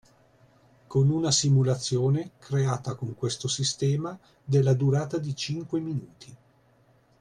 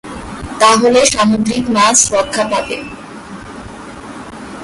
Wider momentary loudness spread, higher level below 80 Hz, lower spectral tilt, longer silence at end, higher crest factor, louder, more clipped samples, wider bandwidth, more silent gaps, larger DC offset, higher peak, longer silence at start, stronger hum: second, 10 LU vs 22 LU; second, -60 dBFS vs -40 dBFS; first, -5.5 dB/octave vs -2.5 dB/octave; first, 0.85 s vs 0 s; about the same, 16 dB vs 14 dB; second, -26 LUFS vs -11 LUFS; neither; about the same, 10.5 kHz vs 11.5 kHz; neither; neither; second, -10 dBFS vs 0 dBFS; first, 0.9 s vs 0.05 s; neither